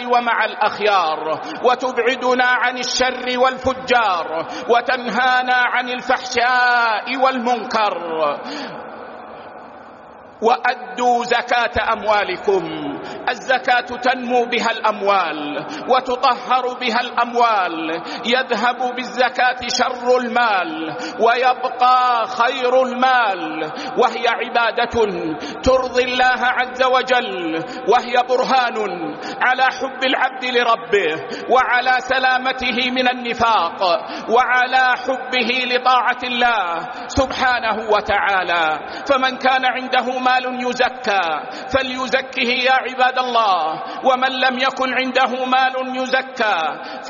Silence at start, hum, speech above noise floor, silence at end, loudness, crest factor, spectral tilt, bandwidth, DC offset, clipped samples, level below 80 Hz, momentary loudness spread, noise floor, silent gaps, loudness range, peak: 0 s; none; 22 dB; 0 s; -18 LUFS; 16 dB; 0 dB/octave; 7.2 kHz; under 0.1%; under 0.1%; -50 dBFS; 8 LU; -40 dBFS; none; 2 LU; -2 dBFS